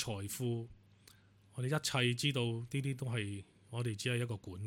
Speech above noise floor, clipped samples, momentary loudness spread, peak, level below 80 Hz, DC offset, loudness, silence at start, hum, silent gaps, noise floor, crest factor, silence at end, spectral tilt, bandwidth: 27 dB; under 0.1%; 12 LU; -18 dBFS; -70 dBFS; under 0.1%; -37 LUFS; 0 s; none; none; -64 dBFS; 20 dB; 0 s; -4.5 dB/octave; 17 kHz